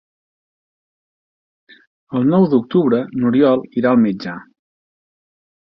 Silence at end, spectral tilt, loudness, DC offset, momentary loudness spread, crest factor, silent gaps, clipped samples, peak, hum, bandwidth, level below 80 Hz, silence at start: 1.35 s; -10 dB/octave; -16 LUFS; under 0.1%; 12 LU; 18 dB; none; under 0.1%; -2 dBFS; none; 5.8 kHz; -60 dBFS; 2.1 s